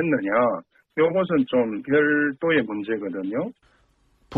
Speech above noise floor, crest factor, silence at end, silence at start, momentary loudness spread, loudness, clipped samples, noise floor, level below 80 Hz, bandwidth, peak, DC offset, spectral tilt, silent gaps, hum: 40 dB; 14 dB; 0 s; 0 s; 9 LU; -23 LUFS; under 0.1%; -62 dBFS; -62 dBFS; 4.6 kHz; -10 dBFS; under 0.1%; -8.5 dB/octave; none; none